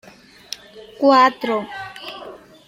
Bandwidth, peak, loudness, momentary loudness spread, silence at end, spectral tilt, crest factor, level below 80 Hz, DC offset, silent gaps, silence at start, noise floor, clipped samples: 16 kHz; -2 dBFS; -16 LUFS; 21 LU; 0.3 s; -4 dB/octave; 18 dB; -64 dBFS; under 0.1%; none; 0.5 s; -39 dBFS; under 0.1%